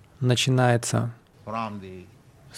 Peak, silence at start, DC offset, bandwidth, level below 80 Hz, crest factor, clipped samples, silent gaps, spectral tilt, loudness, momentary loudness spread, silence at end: -6 dBFS; 0.2 s; under 0.1%; 14 kHz; -60 dBFS; 20 dB; under 0.1%; none; -5 dB/octave; -24 LUFS; 22 LU; 0 s